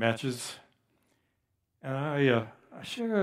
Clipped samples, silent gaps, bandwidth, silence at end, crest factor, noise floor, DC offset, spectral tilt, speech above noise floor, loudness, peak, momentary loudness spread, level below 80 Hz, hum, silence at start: under 0.1%; none; 15 kHz; 0 s; 22 dB; -78 dBFS; under 0.1%; -5.5 dB/octave; 49 dB; -31 LUFS; -10 dBFS; 18 LU; -76 dBFS; none; 0 s